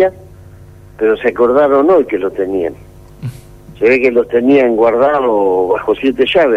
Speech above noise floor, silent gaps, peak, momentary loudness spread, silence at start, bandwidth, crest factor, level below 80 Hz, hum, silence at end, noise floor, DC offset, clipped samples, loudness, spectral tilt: 26 dB; none; -2 dBFS; 9 LU; 0 s; 12 kHz; 10 dB; -44 dBFS; none; 0 s; -37 dBFS; under 0.1%; under 0.1%; -12 LUFS; -7 dB/octave